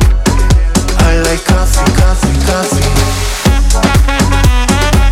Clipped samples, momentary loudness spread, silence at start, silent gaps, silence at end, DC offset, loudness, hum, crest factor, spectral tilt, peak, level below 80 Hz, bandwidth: under 0.1%; 2 LU; 0 s; none; 0 s; under 0.1%; -11 LUFS; none; 8 dB; -4.5 dB/octave; 0 dBFS; -12 dBFS; 16 kHz